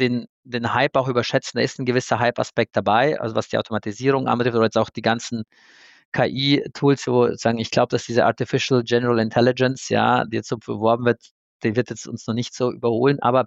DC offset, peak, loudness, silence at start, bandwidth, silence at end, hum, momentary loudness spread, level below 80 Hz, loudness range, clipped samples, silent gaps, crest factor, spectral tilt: under 0.1%; -4 dBFS; -21 LUFS; 0 s; 8.2 kHz; 0 s; none; 9 LU; -62 dBFS; 3 LU; under 0.1%; 0.29-0.43 s, 6.05-6.12 s, 11.31-11.60 s; 16 dB; -5.5 dB/octave